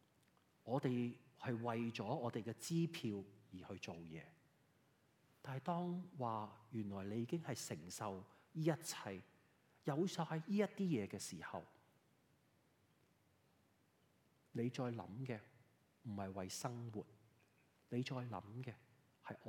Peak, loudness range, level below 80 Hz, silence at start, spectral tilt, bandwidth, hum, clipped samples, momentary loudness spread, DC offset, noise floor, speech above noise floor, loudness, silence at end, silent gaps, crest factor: -24 dBFS; 7 LU; -90 dBFS; 0.65 s; -6 dB/octave; 17 kHz; none; under 0.1%; 13 LU; under 0.1%; -77 dBFS; 32 dB; -45 LUFS; 0 s; none; 22 dB